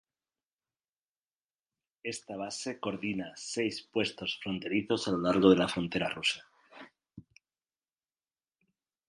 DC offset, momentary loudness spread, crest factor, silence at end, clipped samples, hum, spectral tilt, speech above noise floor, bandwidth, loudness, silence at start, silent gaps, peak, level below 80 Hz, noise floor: under 0.1%; 14 LU; 26 dB; 1.9 s; under 0.1%; none; -4.5 dB/octave; over 59 dB; 11.5 kHz; -31 LUFS; 2.05 s; none; -8 dBFS; -66 dBFS; under -90 dBFS